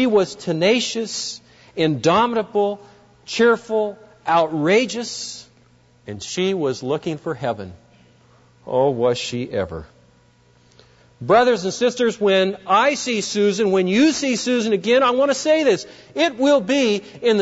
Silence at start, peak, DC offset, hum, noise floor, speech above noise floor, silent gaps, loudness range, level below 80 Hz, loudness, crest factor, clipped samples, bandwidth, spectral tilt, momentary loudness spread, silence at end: 0 s; -4 dBFS; under 0.1%; none; -55 dBFS; 36 dB; none; 8 LU; -58 dBFS; -19 LUFS; 16 dB; under 0.1%; 8 kHz; -4.5 dB/octave; 13 LU; 0 s